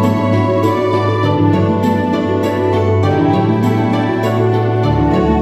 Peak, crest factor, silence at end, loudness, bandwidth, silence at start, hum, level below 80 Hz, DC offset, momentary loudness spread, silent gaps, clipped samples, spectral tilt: 0 dBFS; 12 dB; 0 s; -14 LUFS; 13.5 kHz; 0 s; none; -34 dBFS; under 0.1%; 2 LU; none; under 0.1%; -8 dB/octave